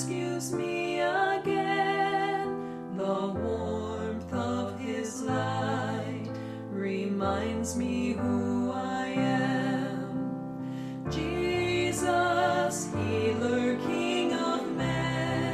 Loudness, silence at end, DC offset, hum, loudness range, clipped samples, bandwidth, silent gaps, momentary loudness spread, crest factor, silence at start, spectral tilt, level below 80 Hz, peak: -30 LUFS; 0 s; under 0.1%; none; 4 LU; under 0.1%; 14.5 kHz; none; 7 LU; 16 dB; 0 s; -5.5 dB/octave; -54 dBFS; -14 dBFS